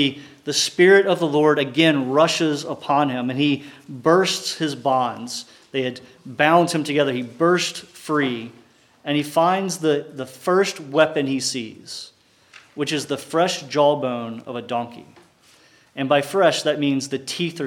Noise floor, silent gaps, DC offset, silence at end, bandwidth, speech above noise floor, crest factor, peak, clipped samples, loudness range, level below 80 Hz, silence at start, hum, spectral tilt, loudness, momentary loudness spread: -54 dBFS; none; under 0.1%; 0 s; 17.5 kHz; 33 dB; 20 dB; -2 dBFS; under 0.1%; 6 LU; -76 dBFS; 0 s; none; -4 dB/octave; -20 LUFS; 15 LU